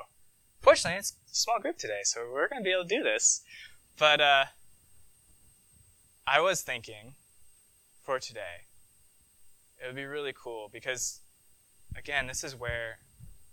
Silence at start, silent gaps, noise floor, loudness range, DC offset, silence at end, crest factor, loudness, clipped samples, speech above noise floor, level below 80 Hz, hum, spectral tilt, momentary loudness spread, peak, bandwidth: 0 s; none; -64 dBFS; 13 LU; under 0.1%; 0.05 s; 26 dB; -29 LUFS; under 0.1%; 33 dB; -60 dBFS; none; -1 dB/octave; 23 LU; -6 dBFS; 19 kHz